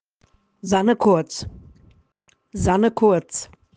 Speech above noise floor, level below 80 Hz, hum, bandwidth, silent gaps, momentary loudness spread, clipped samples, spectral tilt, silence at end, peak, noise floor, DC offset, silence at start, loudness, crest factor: 45 dB; -44 dBFS; none; 9.8 kHz; none; 18 LU; under 0.1%; -5.5 dB/octave; 0.3 s; -4 dBFS; -64 dBFS; under 0.1%; 0.65 s; -20 LUFS; 18 dB